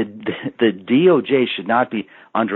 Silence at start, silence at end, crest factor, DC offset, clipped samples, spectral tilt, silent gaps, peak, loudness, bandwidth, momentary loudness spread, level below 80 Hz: 0 s; 0 s; 16 dB; under 0.1%; under 0.1%; -4 dB/octave; none; -2 dBFS; -18 LUFS; 4.2 kHz; 12 LU; -66 dBFS